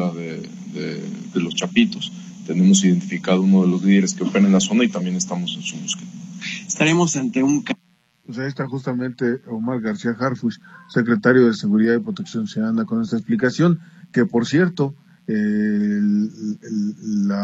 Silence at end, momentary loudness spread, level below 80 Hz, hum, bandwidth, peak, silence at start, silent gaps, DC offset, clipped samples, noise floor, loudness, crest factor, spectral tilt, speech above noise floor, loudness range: 0 s; 13 LU; -66 dBFS; none; 8.2 kHz; 0 dBFS; 0 s; none; under 0.1%; under 0.1%; -60 dBFS; -20 LUFS; 20 dB; -5.5 dB/octave; 41 dB; 5 LU